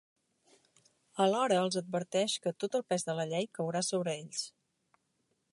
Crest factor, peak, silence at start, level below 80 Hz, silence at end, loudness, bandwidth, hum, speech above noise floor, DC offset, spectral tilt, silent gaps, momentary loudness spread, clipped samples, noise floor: 20 dB; -14 dBFS; 1.15 s; -84 dBFS; 1.05 s; -33 LUFS; 11.5 kHz; none; 46 dB; under 0.1%; -4 dB/octave; none; 9 LU; under 0.1%; -79 dBFS